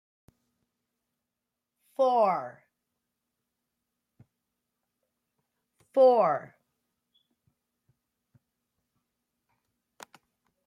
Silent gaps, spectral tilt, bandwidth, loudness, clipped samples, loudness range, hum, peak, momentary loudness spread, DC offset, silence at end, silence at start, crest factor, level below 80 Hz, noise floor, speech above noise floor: none; -6.5 dB/octave; 9.4 kHz; -25 LUFS; under 0.1%; 5 LU; none; -12 dBFS; 17 LU; under 0.1%; 4.2 s; 2 s; 22 dB; -86 dBFS; -87 dBFS; 64 dB